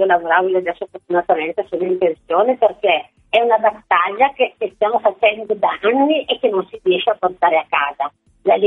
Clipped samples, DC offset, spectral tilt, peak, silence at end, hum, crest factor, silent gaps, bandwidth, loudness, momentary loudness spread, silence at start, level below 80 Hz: under 0.1%; under 0.1%; -6.5 dB/octave; 0 dBFS; 0 s; none; 16 dB; none; 4 kHz; -17 LUFS; 6 LU; 0 s; -60 dBFS